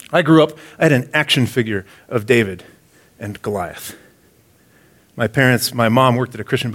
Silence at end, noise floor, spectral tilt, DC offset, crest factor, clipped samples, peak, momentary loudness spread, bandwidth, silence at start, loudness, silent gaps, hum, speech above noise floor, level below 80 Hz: 0 s; -53 dBFS; -5.5 dB/octave; under 0.1%; 18 dB; under 0.1%; 0 dBFS; 14 LU; 17 kHz; 0.1 s; -17 LUFS; none; none; 36 dB; -56 dBFS